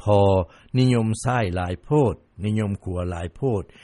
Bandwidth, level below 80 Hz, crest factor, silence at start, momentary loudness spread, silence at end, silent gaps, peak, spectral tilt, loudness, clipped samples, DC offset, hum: 11.5 kHz; -44 dBFS; 16 dB; 0 s; 9 LU; 0.2 s; none; -6 dBFS; -7 dB/octave; -23 LUFS; under 0.1%; under 0.1%; none